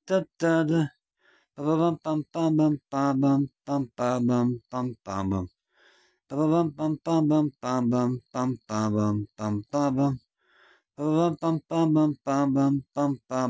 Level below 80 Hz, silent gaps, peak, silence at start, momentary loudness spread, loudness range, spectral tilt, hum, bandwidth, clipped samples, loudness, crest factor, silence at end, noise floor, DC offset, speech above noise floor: -58 dBFS; none; -12 dBFS; 0.05 s; 8 LU; 2 LU; -7.5 dB/octave; none; 8 kHz; under 0.1%; -26 LUFS; 14 dB; 0 s; -65 dBFS; under 0.1%; 40 dB